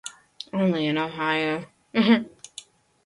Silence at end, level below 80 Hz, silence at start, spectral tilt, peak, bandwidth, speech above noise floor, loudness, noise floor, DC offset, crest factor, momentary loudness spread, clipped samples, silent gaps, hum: 0.75 s; -68 dBFS; 0.05 s; -5.5 dB/octave; -8 dBFS; 11.5 kHz; 25 dB; -24 LUFS; -47 dBFS; under 0.1%; 18 dB; 21 LU; under 0.1%; none; none